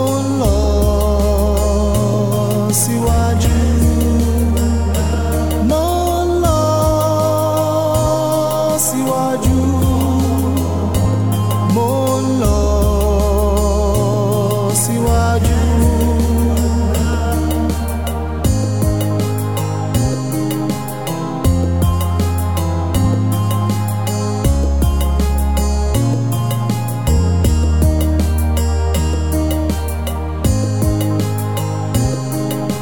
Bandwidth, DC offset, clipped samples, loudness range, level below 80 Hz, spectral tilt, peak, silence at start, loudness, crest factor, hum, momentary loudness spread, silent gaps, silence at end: 18.5 kHz; 1%; under 0.1%; 3 LU; -20 dBFS; -6 dB/octave; -2 dBFS; 0 s; -16 LUFS; 12 dB; none; 4 LU; none; 0 s